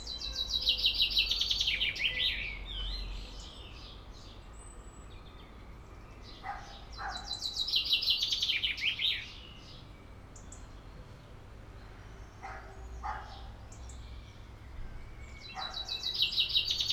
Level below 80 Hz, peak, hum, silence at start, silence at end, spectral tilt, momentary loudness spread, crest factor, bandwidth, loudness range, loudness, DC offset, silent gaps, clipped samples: -48 dBFS; -14 dBFS; none; 0 s; 0 s; -1.5 dB/octave; 24 LU; 24 dB; 19.5 kHz; 18 LU; -30 LUFS; under 0.1%; none; under 0.1%